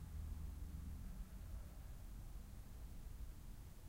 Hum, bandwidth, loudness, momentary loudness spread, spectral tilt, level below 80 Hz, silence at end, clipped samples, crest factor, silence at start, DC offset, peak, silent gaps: none; 16 kHz; -55 LUFS; 6 LU; -6 dB/octave; -52 dBFS; 0 s; under 0.1%; 12 dB; 0 s; under 0.1%; -38 dBFS; none